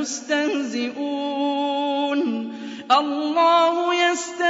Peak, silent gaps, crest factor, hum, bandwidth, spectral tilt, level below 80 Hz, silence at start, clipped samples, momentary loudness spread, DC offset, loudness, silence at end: -4 dBFS; none; 18 dB; none; 8 kHz; -2 dB/octave; -78 dBFS; 0 s; under 0.1%; 9 LU; under 0.1%; -21 LUFS; 0 s